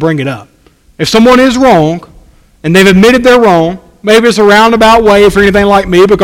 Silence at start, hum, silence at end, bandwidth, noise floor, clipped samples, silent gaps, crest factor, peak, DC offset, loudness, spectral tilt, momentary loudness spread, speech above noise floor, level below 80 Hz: 0 s; none; 0 s; 16.5 kHz; -39 dBFS; 5%; none; 6 dB; 0 dBFS; under 0.1%; -5 LUFS; -5 dB/octave; 12 LU; 34 dB; -30 dBFS